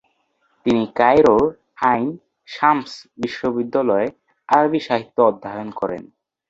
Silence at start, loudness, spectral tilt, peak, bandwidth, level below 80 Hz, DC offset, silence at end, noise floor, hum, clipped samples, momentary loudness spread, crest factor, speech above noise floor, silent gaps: 0.65 s; -19 LUFS; -6.5 dB/octave; -2 dBFS; 7.8 kHz; -54 dBFS; under 0.1%; 0.45 s; -65 dBFS; none; under 0.1%; 14 LU; 18 dB; 47 dB; none